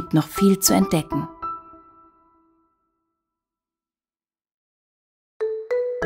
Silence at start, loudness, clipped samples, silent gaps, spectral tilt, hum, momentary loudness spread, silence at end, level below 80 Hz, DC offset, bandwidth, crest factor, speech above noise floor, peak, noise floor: 0 s; -22 LUFS; under 0.1%; 4.54-5.40 s; -5 dB/octave; none; 15 LU; 0 s; -52 dBFS; under 0.1%; 16 kHz; 24 dB; over 71 dB; -2 dBFS; under -90 dBFS